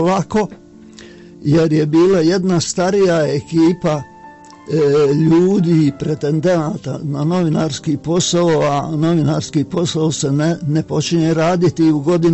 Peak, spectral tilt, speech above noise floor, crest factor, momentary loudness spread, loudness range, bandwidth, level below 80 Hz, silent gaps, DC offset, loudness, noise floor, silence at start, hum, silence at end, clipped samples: -4 dBFS; -6 dB/octave; 24 dB; 12 dB; 7 LU; 2 LU; 8.4 kHz; -48 dBFS; none; under 0.1%; -15 LUFS; -39 dBFS; 0 s; none; 0 s; under 0.1%